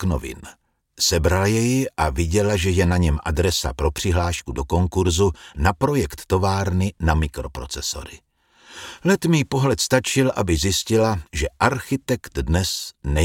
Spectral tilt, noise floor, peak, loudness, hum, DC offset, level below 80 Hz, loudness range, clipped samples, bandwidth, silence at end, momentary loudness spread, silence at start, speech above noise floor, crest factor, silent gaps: -5 dB/octave; -49 dBFS; -2 dBFS; -21 LUFS; none; under 0.1%; -32 dBFS; 3 LU; under 0.1%; 17 kHz; 0 s; 8 LU; 0 s; 29 dB; 18 dB; none